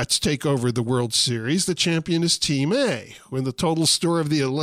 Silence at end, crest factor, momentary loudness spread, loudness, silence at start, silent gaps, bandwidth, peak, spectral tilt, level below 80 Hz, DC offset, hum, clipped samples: 0 s; 14 dB; 6 LU; -21 LUFS; 0 s; none; 16 kHz; -8 dBFS; -4 dB/octave; -52 dBFS; under 0.1%; none; under 0.1%